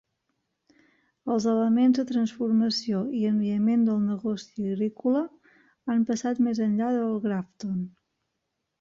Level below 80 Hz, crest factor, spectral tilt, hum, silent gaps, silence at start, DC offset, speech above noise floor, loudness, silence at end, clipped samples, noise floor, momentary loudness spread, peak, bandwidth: -70 dBFS; 14 dB; -6.5 dB/octave; none; none; 1.25 s; under 0.1%; 56 dB; -26 LUFS; 0.9 s; under 0.1%; -81 dBFS; 10 LU; -12 dBFS; 7.6 kHz